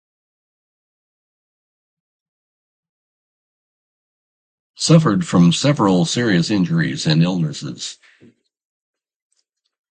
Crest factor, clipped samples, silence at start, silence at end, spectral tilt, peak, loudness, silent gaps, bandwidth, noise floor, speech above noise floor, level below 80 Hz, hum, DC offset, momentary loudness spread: 20 dB; under 0.1%; 4.8 s; 2 s; -5.5 dB/octave; 0 dBFS; -16 LUFS; none; 9.4 kHz; -70 dBFS; 54 dB; -58 dBFS; none; under 0.1%; 13 LU